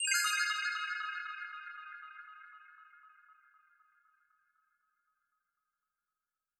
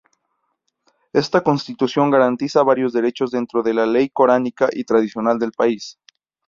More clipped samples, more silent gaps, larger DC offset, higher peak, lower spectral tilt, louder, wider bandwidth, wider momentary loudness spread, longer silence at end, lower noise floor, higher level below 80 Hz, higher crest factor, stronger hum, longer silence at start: neither; neither; neither; second, -16 dBFS vs -2 dBFS; second, 10.5 dB/octave vs -6 dB/octave; second, -35 LUFS vs -18 LUFS; first, 12.5 kHz vs 7.6 kHz; first, 24 LU vs 6 LU; first, 3.25 s vs 0.55 s; first, under -90 dBFS vs -72 dBFS; second, under -90 dBFS vs -62 dBFS; first, 24 dB vs 16 dB; neither; second, 0 s vs 1.15 s